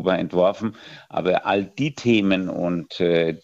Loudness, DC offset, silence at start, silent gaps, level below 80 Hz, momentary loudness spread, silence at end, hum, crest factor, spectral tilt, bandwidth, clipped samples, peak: -22 LUFS; under 0.1%; 0 s; none; -58 dBFS; 11 LU; 0.05 s; none; 16 dB; -6.5 dB/octave; 8 kHz; under 0.1%; -4 dBFS